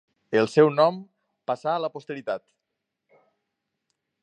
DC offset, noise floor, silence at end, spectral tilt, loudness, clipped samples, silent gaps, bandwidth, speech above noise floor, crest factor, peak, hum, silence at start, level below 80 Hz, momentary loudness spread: under 0.1%; -82 dBFS; 1.85 s; -6.5 dB/octave; -24 LUFS; under 0.1%; none; 9.2 kHz; 59 dB; 22 dB; -6 dBFS; none; 0.3 s; -76 dBFS; 15 LU